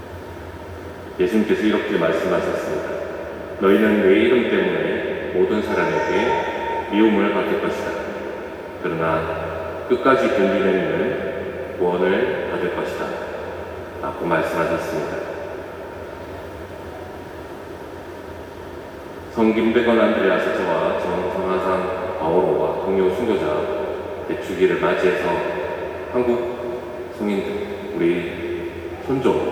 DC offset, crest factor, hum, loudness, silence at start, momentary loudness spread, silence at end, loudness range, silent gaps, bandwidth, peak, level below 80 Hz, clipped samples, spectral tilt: under 0.1%; 20 dB; none; -21 LUFS; 0 s; 17 LU; 0 s; 7 LU; none; 19.5 kHz; -2 dBFS; -50 dBFS; under 0.1%; -6.5 dB/octave